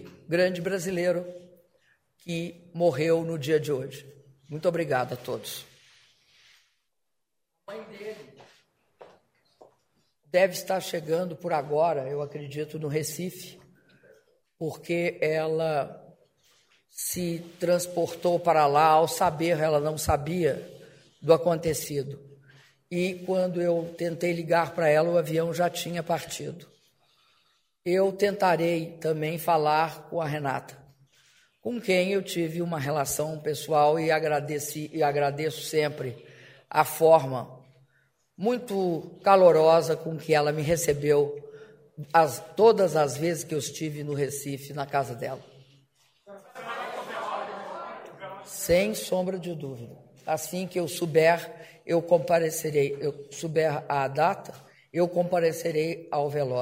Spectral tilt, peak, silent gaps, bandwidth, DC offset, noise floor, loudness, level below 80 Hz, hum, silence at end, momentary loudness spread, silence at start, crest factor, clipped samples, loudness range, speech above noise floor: -5 dB/octave; -6 dBFS; none; 16 kHz; under 0.1%; -83 dBFS; -26 LUFS; -58 dBFS; none; 0 s; 16 LU; 0 s; 22 dB; under 0.1%; 10 LU; 58 dB